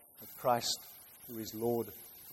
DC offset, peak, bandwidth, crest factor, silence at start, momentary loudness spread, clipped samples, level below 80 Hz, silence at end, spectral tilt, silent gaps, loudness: under 0.1%; -18 dBFS; 16.5 kHz; 20 dB; 0.2 s; 17 LU; under 0.1%; -72 dBFS; 0 s; -3.5 dB/octave; none; -36 LUFS